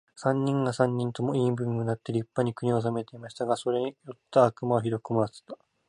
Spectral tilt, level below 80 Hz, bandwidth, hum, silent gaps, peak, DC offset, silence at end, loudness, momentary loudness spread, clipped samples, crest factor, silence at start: -7.5 dB/octave; -66 dBFS; 11 kHz; none; none; -8 dBFS; under 0.1%; 0.35 s; -28 LUFS; 11 LU; under 0.1%; 20 dB; 0.15 s